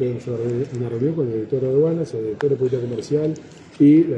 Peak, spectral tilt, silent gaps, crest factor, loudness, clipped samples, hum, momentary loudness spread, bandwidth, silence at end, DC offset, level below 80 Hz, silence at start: -6 dBFS; -9 dB/octave; none; 14 dB; -21 LUFS; under 0.1%; none; 9 LU; 8.6 kHz; 0 s; under 0.1%; -58 dBFS; 0 s